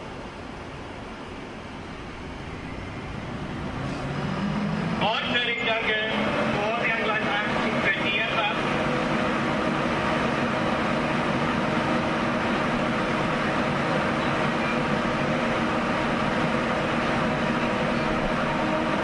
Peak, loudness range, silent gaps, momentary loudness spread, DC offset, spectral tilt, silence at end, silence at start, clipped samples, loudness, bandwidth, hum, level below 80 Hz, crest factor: -10 dBFS; 8 LU; none; 14 LU; under 0.1%; -5.5 dB/octave; 0 s; 0 s; under 0.1%; -25 LUFS; 11.5 kHz; none; -46 dBFS; 16 dB